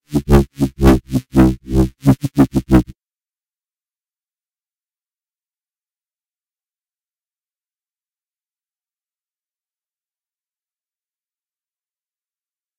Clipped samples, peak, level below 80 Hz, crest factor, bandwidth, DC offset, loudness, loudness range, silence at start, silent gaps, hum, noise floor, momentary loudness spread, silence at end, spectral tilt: under 0.1%; 0 dBFS; -28 dBFS; 20 dB; 16 kHz; under 0.1%; -15 LUFS; 7 LU; 0.1 s; none; none; under -90 dBFS; 5 LU; 9.95 s; -8 dB/octave